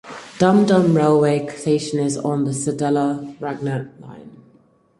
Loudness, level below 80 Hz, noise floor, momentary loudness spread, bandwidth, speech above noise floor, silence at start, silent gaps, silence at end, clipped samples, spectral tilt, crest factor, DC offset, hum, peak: -19 LUFS; -60 dBFS; -55 dBFS; 14 LU; 11.5 kHz; 37 dB; 0.05 s; none; 0.65 s; under 0.1%; -6.5 dB/octave; 18 dB; under 0.1%; none; -2 dBFS